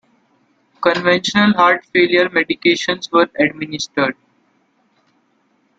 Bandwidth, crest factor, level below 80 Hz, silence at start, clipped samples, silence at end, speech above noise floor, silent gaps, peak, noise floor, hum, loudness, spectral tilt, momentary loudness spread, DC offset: 8 kHz; 18 dB; -58 dBFS; 0.8 s; under 0.1%; 1.65 s; 46 dB; none; 0 dBFS; -61 dBFS; none; -15 LUFS; -4.5 dB/octave; 7 LU; under 0.1%